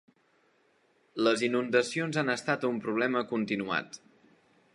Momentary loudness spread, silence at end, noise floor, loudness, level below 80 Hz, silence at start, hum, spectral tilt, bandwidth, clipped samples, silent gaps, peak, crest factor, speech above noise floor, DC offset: 7 LU; 0.75 s; -68 dBFS; -29 LUFS; -76 dBFS; 1.15 s; none; -4.5 dB/octave; 11.5 kHz; under 0.1%; none; -12 dBFS; 20 dB; 39 dB; under 0.1%